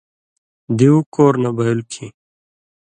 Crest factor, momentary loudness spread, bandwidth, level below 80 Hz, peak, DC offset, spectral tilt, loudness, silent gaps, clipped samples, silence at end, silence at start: 18 dB; 18 LU; 9.8 kHz; -58 dBFS; 0 dBFS; under 0.1%; -7.5 dB/octave; -16 LUFS; 1.06-1.12 s; under 0.1%; 0.8 s; 0.7 s